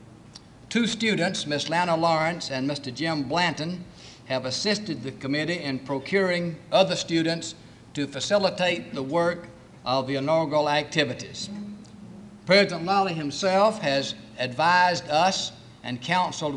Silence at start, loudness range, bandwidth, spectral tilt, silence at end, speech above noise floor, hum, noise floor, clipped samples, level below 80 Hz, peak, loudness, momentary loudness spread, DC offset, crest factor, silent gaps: 0 s; 4 LU; 11 kHz; -4 dB/octave; 0 s; 23 dB; none; -48 dBFS; under 0.1%; -62 dBFS; -6 dBFS; -25 LUFS; 14 LU; under 0.1%; 20 dB; none